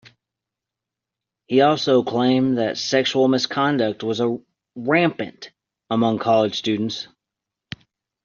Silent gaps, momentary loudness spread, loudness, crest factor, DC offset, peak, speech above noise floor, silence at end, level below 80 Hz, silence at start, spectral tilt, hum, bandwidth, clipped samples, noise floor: none; 20 LU; -20 LUFS; 18 dB; under 0.1%; -4 dBFS; 66 dB; 1.2 s; -64 dBFS; 1.5 s; -4 dB/octave; none; 7.4 kHz; under 0.1%; -86 dBFS